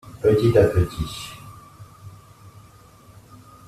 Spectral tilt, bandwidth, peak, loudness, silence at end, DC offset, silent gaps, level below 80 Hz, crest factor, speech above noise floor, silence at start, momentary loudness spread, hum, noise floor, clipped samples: -7 dB/octave; 14.5 kHz; -4 dBFS; -20 LUFS; 1.6 s; under 0.1%; none; -42 dBFS; 20 dB; 30 dB; 0.05 s; 27 LU; none; -49 dBFS; under 0.1%